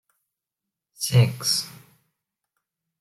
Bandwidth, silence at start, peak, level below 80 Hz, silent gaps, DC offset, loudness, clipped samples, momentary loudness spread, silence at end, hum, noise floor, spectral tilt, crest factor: 15 kHz; 1 s; -6 dBFS; -62 dBFS; none; under 0.1%; -22 LUFS; under 0.1%; 11 LU; 1.3 s; none; -86 dBFS; -4 dB/octave; 22 dB